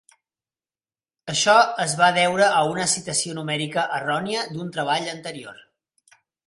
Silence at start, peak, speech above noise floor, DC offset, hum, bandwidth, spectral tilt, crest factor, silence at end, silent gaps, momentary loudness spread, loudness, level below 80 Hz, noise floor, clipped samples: 1.25 s; -4 dBFS; over 68 dB; under 0.1%; none; 11.5 kHz; -2.5 dB/octave; 20 dB; 0.95 s; none; 15 LU; -21 LUFS; -66 dBFS; under -90 dBFS; under 0.1%